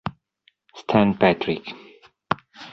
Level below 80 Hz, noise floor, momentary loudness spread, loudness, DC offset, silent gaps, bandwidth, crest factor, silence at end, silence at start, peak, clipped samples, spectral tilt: -54 dBFS; -64 dBFS; 20 LU; -22 LUFS; under 0.1%; none; 6.4 kHz; 22 dB; 0 s; 0.05 s; -2 dBFS; under 0.1%; -7.5 dB/octave